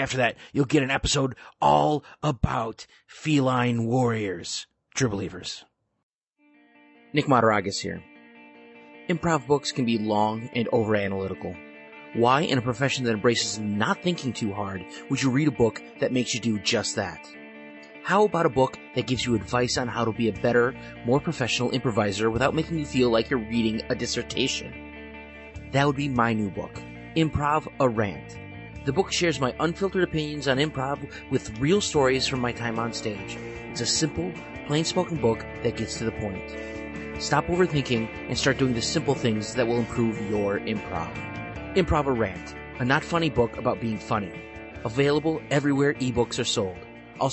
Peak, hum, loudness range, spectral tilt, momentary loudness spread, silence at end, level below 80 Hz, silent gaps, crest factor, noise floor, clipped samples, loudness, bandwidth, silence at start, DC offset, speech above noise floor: -8 dBFS; none; 3 LU; -5 dB/octave; 13 LU; 0 s; -48 dBFS; 6.03-6.21 s; 18 dB; -63 dBFS; under 0.1%; -25 LUFS; 8.4 kHz; 0 s; under 0.1%; 37 dB